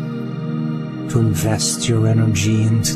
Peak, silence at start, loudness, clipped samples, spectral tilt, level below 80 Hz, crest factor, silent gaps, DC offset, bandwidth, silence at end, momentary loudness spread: -4 dBFS; 0 s; -18 LUFS; under 0.1%; -5 dB/octave; -44 dBFS; 14 dB; none; under 0.1%; 15 kHz; 0 s; 9 LU